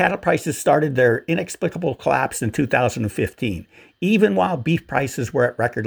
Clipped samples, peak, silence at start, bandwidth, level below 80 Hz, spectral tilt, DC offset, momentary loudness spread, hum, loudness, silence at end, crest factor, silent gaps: under 0.1%; -2 dBFS; 0 s; over 20 kHz; -50 dBFS; -5.5 dB/octave; under 0.1%; 7 LU; none; -20 LUFS; 0 s; 18 dB; none